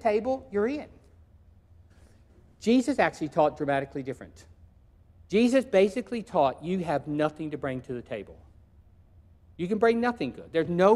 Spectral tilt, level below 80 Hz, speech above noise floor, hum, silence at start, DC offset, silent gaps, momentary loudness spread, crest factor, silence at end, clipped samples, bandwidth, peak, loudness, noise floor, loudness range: -6.5 dB/octave; -58 dBFS; 31 dB; none; 0.05 s; under 0.1%; none; 14 LU; 20 dB; 0 s; under 0.1%; 12 kHz; -8 dBFS; -27 LUFS; -57 dBFS; 4 LU